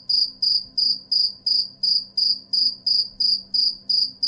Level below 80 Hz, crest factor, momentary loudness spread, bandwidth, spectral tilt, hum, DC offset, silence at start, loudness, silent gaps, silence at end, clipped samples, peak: -62 dBFS; 12 dB; 2 LU; 11.5 kHz; -1 dB/octave; none; under 0.1%; 0.1 s; -19 LUFS; none; 0 s; under 0.1%; -10 dBFS